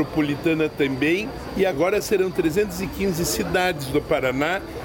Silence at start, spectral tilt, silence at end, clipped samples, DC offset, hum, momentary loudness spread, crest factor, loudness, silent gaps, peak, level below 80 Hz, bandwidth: 0 s; -5 dB/octave; 0 s; under 0.1%; under 0.1%; none; 4 LU; 14 dB; -22 LUFS; none; -8 dBFS; -42 dBFS; 17 kHz